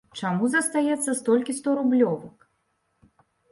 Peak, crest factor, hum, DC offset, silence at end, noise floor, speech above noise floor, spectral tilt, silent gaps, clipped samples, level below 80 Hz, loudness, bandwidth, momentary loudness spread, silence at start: -10 dBFS; 16 dB; none; under 0.1%; 1.2 s; -72 dBFS; 49 dB; -4.5 dB/octave; none; under 0.1%; -72 dBFS; -24 LUFS; 11.5 kHz; 4 LU; 0.15 s